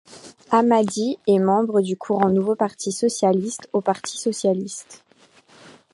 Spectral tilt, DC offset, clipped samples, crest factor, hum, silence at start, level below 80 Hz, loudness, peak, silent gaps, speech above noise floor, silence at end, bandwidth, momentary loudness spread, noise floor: -5.5 dB/octave; under 0.1%; under 0.1%; 18 dB; none; 0.1 s; -66 dBFS; -21 LUFS; -4 dBFS; none; 33 dB; 0.25 s; 11.5 kHz; 7 LU; -54 dBFS